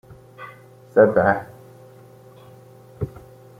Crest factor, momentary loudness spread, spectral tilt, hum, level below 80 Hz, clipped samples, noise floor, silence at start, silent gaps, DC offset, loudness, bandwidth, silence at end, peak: 22 dB; 25 LU; -8.5 dB/octave; none; -54 dBFS; under 0.1%; -46 dBFS; 0.1 s; none; under 0.1%; -20 LUFS; 15 kHz; 0.5 s; -2 dBFS